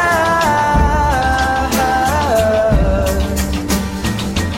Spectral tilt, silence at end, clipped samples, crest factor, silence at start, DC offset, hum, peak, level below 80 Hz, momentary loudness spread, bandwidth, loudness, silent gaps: -5 dB/octave; 0 s; under 0.1%; 12 dB; 0 s; under 0.1%; none; -2 dBFS; -22 dBFS; 5 LU; 16.5 kHz; -15 LUFS; none